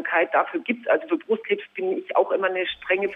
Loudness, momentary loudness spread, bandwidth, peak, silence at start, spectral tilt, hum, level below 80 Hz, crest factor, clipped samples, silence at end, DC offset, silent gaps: -24 LUFS; 6 LU; 3.9 kHz; -8 dBFS; 0 s; -6.5 dB/octave; none; -68 dBFS; 16 dB; under 0.1%; 0 s; under 0.1%; none